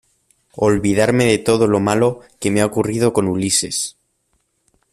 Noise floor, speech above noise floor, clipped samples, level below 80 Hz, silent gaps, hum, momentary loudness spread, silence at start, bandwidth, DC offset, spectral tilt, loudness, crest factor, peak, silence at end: -66 dBFS; 50 dB; under 0.1%; -48 dBFS; none; none; 6 LU; 0.55 s; 15 kHz; under 0.1%; -4.5 dB/octave; -17 LUFS; 16 dB; -2 dBFS; 1 s